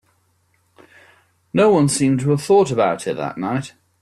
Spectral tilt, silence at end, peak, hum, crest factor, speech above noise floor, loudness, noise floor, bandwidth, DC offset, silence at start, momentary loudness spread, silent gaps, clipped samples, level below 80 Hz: -6 dB/octave; 0.35 s; -4 dBFS; none; 16 dB; 46 dB; -18 LUFS; -63 dBFS; 13.5 kHz; under 0.1%; 1.55 s; 10 LU; none; under 0.1%; -56 dBFS